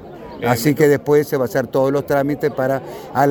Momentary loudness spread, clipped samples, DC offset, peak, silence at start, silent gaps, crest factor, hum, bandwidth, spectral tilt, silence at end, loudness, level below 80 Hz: 10 LU; under 0.1%; under 0.1%; 0 dBFS; 0 s; none; 18 dB; none; 19 kHz; -6.5 dB/octave; 0 s; -18 LUFS; -52 dBFS